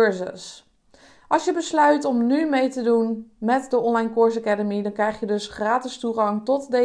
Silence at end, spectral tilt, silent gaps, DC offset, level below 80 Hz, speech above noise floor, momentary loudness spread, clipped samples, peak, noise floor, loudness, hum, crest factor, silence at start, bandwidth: 0 s; -5 dB/octave; none; under 0.1%; -62 dBFS; 32 dB; 8 LU; under 0.1%; -6 dBFS; -54 dBFS; -22 LUFS; none; 16 dB; 0 s; 10.5 kHz